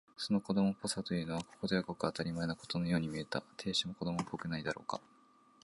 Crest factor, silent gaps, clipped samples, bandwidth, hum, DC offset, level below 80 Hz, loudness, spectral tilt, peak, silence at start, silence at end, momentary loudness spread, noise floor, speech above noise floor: 22 dB; none; under 0.1%; 11.5 kHz; none; under 0.1%; -64 dBFS; -37 LUFS; -5 dB/octave; -16 dBFS; 0.2 s; 0.65 s; 7 LU; -66 dBFS; 29 dB